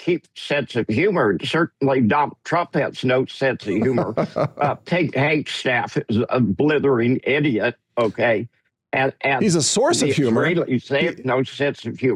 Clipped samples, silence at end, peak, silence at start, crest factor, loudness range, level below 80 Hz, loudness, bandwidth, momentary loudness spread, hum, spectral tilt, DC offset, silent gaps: under 0.1%; 0 s; -8 dBFS; 0 s; 12 dB; 2 LU; -62 dBFS; -20 LUFS; 12.5 kHz; 6 LU; none; -5 dB/octave; under 0.1%; none